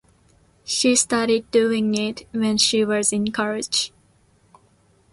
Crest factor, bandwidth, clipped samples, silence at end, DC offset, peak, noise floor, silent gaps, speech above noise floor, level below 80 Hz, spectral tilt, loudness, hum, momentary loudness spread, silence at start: 18 dB; 11.5 kHz; under 0.1%; 1.25 s; under 0.1%; -4 dBFS; -59 dBFS; none; 38 dB; -58 dBFS; -2.5 dB/octave; -20 LUFS; none; 8 LU; 0.65 s